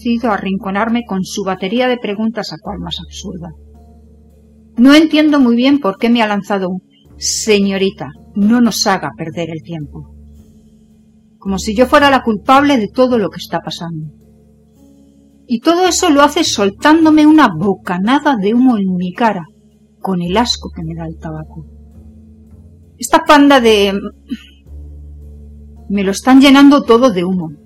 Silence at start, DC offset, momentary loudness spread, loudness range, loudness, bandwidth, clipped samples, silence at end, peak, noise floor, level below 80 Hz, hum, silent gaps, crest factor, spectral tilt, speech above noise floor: 0.05 s; under 0.1%; 19 LU; 8 LU; -12 LUFS; 15.5 kHz; 0.1%; 0.1 s; 0 dBFS; -48 dBFS; -40 dBFS; none; none; 14 dB; -4.5 dB/octave; 36 dB